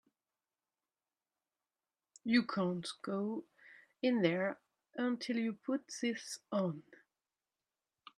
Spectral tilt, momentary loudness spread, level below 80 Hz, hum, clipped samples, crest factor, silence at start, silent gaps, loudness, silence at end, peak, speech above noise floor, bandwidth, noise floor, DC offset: -5.5 dB/octave; 12 LU; -84 dBFS; none; under 0.1%; 24 dB; 2.25 s; none; -37 LUFS; 1.2 s; -16 dBFS; over 54 dB; 13 kHz; under -90 dBFS; under 0.1%